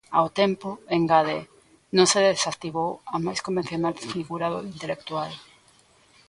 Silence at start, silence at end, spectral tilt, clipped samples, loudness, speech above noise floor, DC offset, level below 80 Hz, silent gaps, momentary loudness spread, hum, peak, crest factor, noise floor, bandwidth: 0.1 s; 0.85 s; -4 dB/octave; under 0.1%; -25 LUFS; 34 dB; under 0.1%; -62 dBFS; none; 13 LU; none; -4 dBFS; 20 dB; -58 dBFS; 11.5 kHz